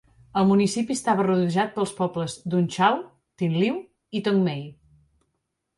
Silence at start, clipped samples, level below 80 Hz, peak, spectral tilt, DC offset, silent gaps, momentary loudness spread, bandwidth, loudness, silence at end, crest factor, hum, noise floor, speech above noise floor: 0.35 s; under 0.1%; -62 dBFS; -6 dBFS; -6 dB/octave; under 0.1%; none; 9 LU; 11.5 kHz; -24 LUFS; 1.05 s; 18 dB; none; -77 dBFS; 55 dB